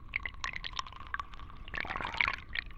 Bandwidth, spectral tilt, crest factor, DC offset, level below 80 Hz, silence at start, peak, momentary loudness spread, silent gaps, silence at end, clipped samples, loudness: 9.2 kHz; -2.5 dB/octave; 28 dB; under 0.1%; -48 dBFS; 0 s; -10 dBFS; 11 LU; none; 0 s; under 0.1%; -36 LUFS